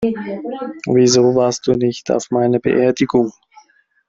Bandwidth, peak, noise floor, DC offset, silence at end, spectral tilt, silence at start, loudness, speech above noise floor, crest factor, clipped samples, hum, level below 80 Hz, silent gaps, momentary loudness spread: 7.8 kHz; -2 dBFS; -51 dBFS; under 0.1%; 0.75 s; -5 dB/octave; 0 s; -16 LUFS; 36 dB; 14 dB; under 0.1%; none; -52 dBFS; none; 13 LU